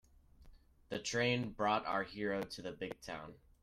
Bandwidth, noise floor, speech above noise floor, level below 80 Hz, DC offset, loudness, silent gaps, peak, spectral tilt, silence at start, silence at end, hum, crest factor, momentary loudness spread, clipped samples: 15.5 kHz; -61 dBFS; 23 dB; -64 dBFS; under 0.1%; -38 LUFS; none; -20 dBFS; -4.5 dB/octave; 0.4 s; 0.25 s; none; 20 dB; 13 LU; under 0.1%